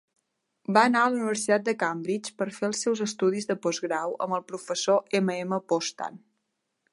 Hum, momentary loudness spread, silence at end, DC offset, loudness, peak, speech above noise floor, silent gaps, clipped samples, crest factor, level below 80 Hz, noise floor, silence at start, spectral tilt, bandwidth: none; 10 LU; 0.75 s; under 0.1%; -27 LUFS; -4 dBFS; 53 dB; none; under 0.1%; 22 dB; -80 dBFS; -79 dBFS; 0.7 s; -4 dB/octave; 11.5 kHz